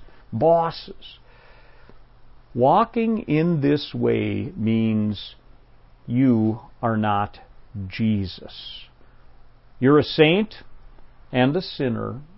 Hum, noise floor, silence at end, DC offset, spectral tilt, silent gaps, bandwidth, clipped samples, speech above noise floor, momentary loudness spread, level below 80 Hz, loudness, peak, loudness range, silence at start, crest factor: none; -50 dBFS; 0.1 s; under 0.1%; -11.5 dB/octave; none; 5.8 kHz; under 0.1%; 28 dB; 18 LU; -50 dBFS; -22 LUFS; -2 dBFS; 3 LU; 0 s; 20 dB